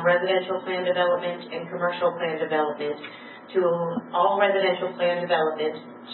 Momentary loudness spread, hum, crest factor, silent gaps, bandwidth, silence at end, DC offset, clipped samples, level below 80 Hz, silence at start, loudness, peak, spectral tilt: 11 LU; none; 18 dB; none; 4.3 kHz; 0 s; under 0.1%; under 0.1%; -84 dBFS; 0 s; -25 LUFS; -6 dBFS; -9.5 dB/octave